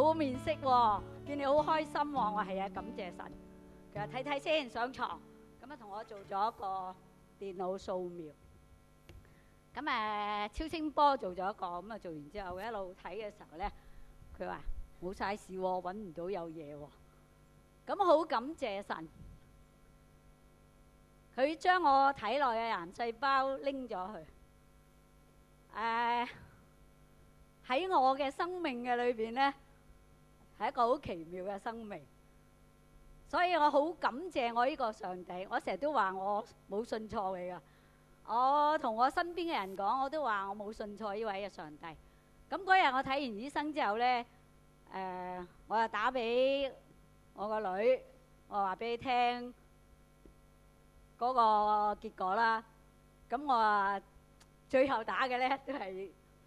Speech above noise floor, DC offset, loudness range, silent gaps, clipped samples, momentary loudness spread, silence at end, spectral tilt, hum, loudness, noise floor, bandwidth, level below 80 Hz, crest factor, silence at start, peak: 29 dB; under 0.1%; 8 LU; none; under 0.1%; 17 LU; 0.35 s; -5 dB/octave; 50 Hz at -65 dBFS; -35 LUFS; -63 dBFS; 13.5 kHz; -60 dBFS; 22 dB; 0 s; -14 dBFS